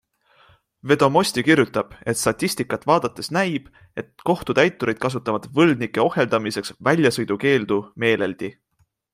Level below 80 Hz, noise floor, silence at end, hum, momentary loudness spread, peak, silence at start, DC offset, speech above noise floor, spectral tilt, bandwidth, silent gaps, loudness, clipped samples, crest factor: -56 dBFS; -57 dBFS; 0.65 s; none; 10 LU; -2 dBFS; 0.85 s; under 0.1%; 36 dB; -5 dB/octave; 15.5 kHz; none; -21 LUFS; under 0.1%; 20 dB